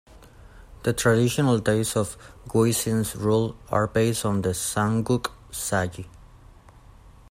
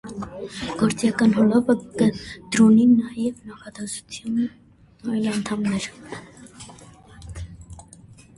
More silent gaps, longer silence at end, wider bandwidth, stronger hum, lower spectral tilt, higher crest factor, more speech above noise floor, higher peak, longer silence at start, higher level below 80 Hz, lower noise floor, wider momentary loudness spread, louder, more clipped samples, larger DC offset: neither; second, 0.25 s vs 0.55 s; first, 16 kHz vs 11.5 kHz; neither; about the same, -5 dB/octave vs -5.5 dB/octave; about the same, 18 dB vs 18 dB; about the same, 26 dB vs 26 dB; about the same, -8 dBFS vs -6 dBFS; first, 0.4 s vs 0.05 s; about the same, -48 dBFS vs -50 dBFS; about the same, -49 dBFS vs -47 dBFS; second, 11 LU vs 23 LU; second, -24 LUFS vs -21 LUFS; neither; neither